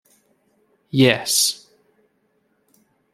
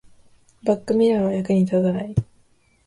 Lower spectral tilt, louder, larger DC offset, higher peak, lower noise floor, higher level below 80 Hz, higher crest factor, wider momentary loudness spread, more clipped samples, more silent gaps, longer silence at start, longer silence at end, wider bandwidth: second, -3.5 dB/octave vs -8.5 dB/octave; first, -17 LUFS vs -21 LUFS; neither; first, -2 dBFS vs -6 dBFS; first, -66 dBFS vs -59 dBFS; second, -64 dBFS vs -48 dBFS; first, 22 dB vs 16 dB; first, 11 LU vs 8 LU; neither; neither; first, 0.95 s vs 0.65 s; first, 1.6 s vs 0.65 s; first, 16 kHz vs 11 kHz